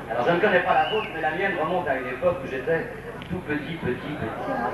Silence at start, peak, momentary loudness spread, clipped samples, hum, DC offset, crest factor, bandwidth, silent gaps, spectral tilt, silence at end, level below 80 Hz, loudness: 0 s; -8 dBFS; 10 LU; under 0.1%; none; under 0.1%; 18 dB; 12.5 kHz; none; -6.5 dB/octave; 0 s; -50 dBFS; -25 LUFS